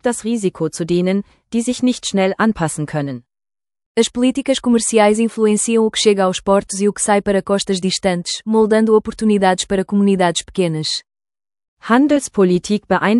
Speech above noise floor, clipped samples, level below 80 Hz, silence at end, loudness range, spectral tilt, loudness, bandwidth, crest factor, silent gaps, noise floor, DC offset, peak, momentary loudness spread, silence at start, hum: over 74 dB; under 0.1%; -48 dBFS; 0 s; 4 LU; -4.5 dB/octave; -16 LUFS; 12 kHz; 16 dB; 3.86-3.95 s, 11.68-11.77 s; under -90 dBFS; under 0.1%; 0 dBFS; 8 LU; 0.05 s; none